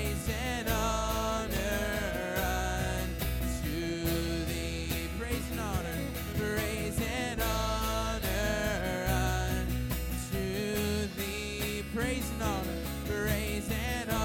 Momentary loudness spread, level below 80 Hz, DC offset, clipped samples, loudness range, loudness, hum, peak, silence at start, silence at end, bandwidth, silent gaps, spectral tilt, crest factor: 4 LU; -38 dBFS; under 0.1%; under 0.1%; 2 LU; -33 LUFS; none; -16 dBFS; 0 s; 0 s; 18 kHz; none; -4.5 dB/octave; 16 dB